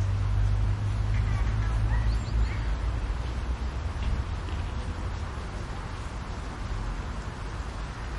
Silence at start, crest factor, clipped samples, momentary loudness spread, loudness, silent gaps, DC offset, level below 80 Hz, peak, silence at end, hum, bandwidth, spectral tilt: 0 s; 12 dB; under 0.1%; 9 LU; -31 LUFS; none; under 0.1%; -30 dBFS; -16 dBFS; 0 s; none; 11 kHz; -6.5 dB/octave